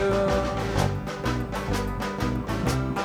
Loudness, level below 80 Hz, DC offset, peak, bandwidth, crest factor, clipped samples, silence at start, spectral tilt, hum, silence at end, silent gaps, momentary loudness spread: -27 LUFS; -36 dBFS; under 0.1%; -10 dBFS; 19.5 kHz; 16 dB; under 0.1%; 0 s; -6 dB/octave; none; 0 s; none; 5 LU